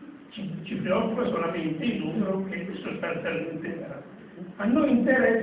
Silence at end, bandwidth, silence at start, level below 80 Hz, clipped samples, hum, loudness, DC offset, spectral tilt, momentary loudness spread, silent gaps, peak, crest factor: 0 s; 4 kHz; 0 s; -60 dBFS; under 0.1%; none; -27 LUFS; under 0.1%; -10.5 dB/octave; 18 LU; none; -8 dBFS; 18 dB